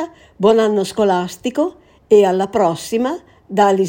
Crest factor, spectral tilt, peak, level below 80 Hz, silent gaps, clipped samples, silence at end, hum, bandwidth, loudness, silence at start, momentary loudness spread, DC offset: 16 dB; -5.5 dB/octave; 0 dBFS; -54 dBFS; none; under 0.1%; 0 s; none; 17 kHz; -16 LUFS; 0 s; 10 LU; under 0.1%